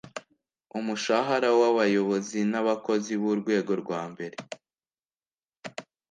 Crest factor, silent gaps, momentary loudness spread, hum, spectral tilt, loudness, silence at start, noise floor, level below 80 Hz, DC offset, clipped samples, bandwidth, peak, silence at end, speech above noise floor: 18 dB; 5.59-5.63 s; 20 LU; none; -5 dB/octave; -26 LUFS; 0.05 s; under -90 dBFS; -76 dBFS; under 0.1%; under 0.1%; 9.6 kHz; -10 dBFS; 0.3 s; over 64 dB